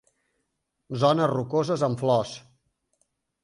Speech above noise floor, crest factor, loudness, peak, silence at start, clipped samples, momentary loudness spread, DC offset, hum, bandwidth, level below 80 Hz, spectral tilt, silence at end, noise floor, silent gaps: 54 dB; 20 dB; -24 LUFS; -8 dBFS; 0.9 s; under 0.1%; 15 LU; under 0.1%; none; 11.5 kHz; -64 dBFS; -6.5 dB/octave; 1.05 s; -78 dBFS; none